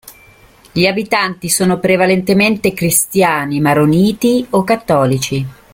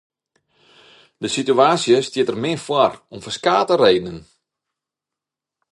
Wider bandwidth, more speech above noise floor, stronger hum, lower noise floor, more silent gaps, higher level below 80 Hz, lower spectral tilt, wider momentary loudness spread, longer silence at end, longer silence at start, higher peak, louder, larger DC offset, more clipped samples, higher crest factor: first, 17 kHz vs 11.5 kHz; second, 31 dB vs 69 dB; neither; second, -44 dBFS vs -86 dBFS; neither; first, -46 dBFS vs -58 dBFS; about the same, -4.5 dB/octave vs -4.5 dB/octave; second, 4 LU vs 15 LU; second, 0.2 s vs 1.5 s; second, 0.05 s vs 1.2 s; about the same, 0 dBFS vs 0 dBFS; first, -13 LUFS vs -18 LUFS; neither; neither; second, 14 dB vs 20 dB